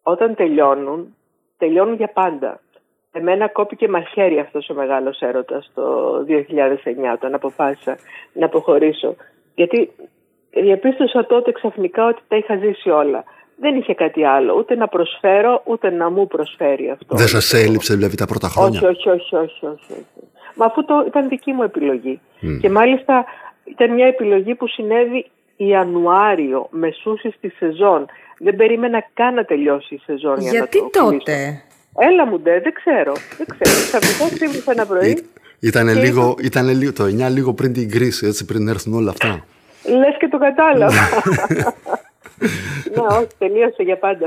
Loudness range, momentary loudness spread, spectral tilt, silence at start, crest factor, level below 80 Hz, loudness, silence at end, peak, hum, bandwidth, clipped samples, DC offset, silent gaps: 4 LU; 11 LU; -5 dB/octave; 0.05 s; 16 dB; -50 dBFS; -16 LUFS; 0 s; -2 dBFS; none; 16 kHz; under 0.1%; under 0.1%; none